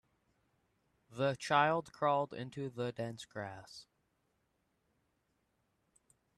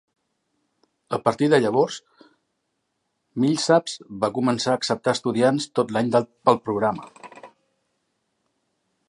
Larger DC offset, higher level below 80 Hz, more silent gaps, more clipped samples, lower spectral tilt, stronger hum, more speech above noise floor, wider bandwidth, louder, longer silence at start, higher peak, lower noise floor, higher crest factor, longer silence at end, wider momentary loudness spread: neither; second, -78 dBFS vs -66 dBFS; neither; neither; about the same, -5.5 dB/octave vs -5 dB/octave; neither; second, 44 dB vs 54 dB; about the same, 12.5 kHz vs 11.5 kHz; second, -36 LUFS vs -22 LUFS; about the same, 1.1 s vs 1.1 s; second, -16 dBFS vs -2 dBFS; first, -80 dBFS vs -76 dBFS; about the same, 24 dB vs 22 dB; first, 2.55 s vs 1.6 s; first, 21 LU vs 11 LU